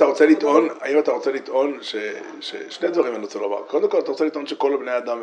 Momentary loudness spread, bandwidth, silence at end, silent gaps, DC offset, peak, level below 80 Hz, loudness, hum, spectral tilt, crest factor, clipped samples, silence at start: 12 LU; 9.4 kHz; 0 s; none; under 0.1%; -2 dBFS; -82 dBFS; -21 LUFS; none; -4 dB/octave; 18 dB; under 0.1%; 0 s